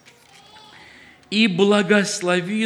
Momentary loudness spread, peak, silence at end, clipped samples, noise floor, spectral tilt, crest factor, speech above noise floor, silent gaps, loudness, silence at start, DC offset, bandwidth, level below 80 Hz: 5 LU; -4 dBFS; 0 s; under 0.1%; -49 dBFS; -4.5 dB/octave; 18 dB; 31 dB; none; -18 LUFS; 1.3 s; under 0.1%; 12.5 kHz; -70 dBFS